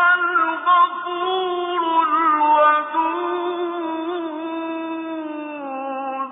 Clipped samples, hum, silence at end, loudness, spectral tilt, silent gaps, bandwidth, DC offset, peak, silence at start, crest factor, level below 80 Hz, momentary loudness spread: under 0.1%; none; 0 s; -20 LUFS; -6 dB/octave; none; 3.9 kHz; under 0.1%; -6 dBFS; 0 s; 14 dB; -74 dBFS; 12 LU